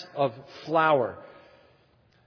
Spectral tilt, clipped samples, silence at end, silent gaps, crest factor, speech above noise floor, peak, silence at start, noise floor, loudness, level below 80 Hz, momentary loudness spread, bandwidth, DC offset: -7 dB/octave; under 0.1%; 1 s; none; 20 dB; 37 dB; -8 dBFS; 0 s; -63 dBFS; -26 LUFS; -74 dBFS; 19 LU; 5.4 kHz; under 0.1%